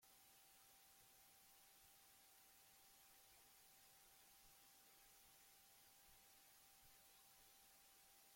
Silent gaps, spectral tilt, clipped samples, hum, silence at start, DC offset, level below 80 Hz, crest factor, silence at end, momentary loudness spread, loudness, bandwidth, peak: none; -0.5 dB/octave; under 0.1%; none; 0 s; under 0.1%; -88 dBFS; 14 dB; 0 s; 0 LU; -68 LUFS; 16.5 kHz; -56 dBFS